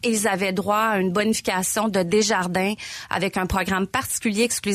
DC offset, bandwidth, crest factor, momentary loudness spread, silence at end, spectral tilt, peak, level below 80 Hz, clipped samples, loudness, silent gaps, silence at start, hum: under 0.1%; 15.5 kHz; 14 dB; 4 LU; 0 s; -3.5 dB/octave; -8 dBFS; -44 dBFS; under 0.1%; -22 LUFS; none; 0.05 s; none